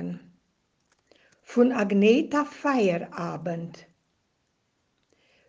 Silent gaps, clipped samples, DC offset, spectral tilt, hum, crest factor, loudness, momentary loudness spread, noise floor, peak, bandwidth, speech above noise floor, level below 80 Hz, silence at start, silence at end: none; under 0.1%; under 0.1%; -6.5 dB/octave; none; 20 dB; -25 LUFS; 16 LU; -74 dBFS; -8 dBFS; 7.6 kHz; 50 dB; -72 dBFS; 0 s; 1.75 s